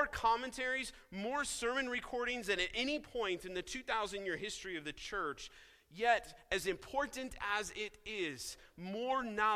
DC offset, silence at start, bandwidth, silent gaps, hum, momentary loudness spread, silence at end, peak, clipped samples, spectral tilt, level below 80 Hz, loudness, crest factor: under 0.1%; 0 s; 16 kHz; none; none; 10 LU; 0 s; -16 dBFS; under 0.1%; -2.5 dB/octave; -62 dBFS; -38 LUFS; 22 dB